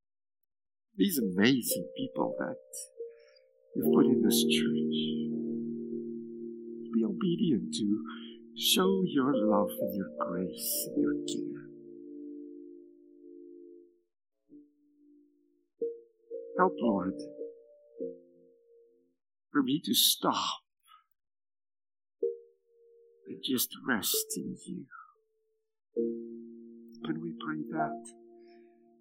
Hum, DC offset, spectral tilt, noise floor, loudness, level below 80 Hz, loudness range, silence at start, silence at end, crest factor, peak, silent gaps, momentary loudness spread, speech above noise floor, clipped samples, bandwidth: none; under 0.1%; -4 dB/octave; -79 dBFS; -31 LUFS; -80 dBFS; 11 LU; 0.95 s; 0.55 s; 24 dB; -10 dBFS; none; 21 LU; 49 dB; under 0.1%; 16 kHz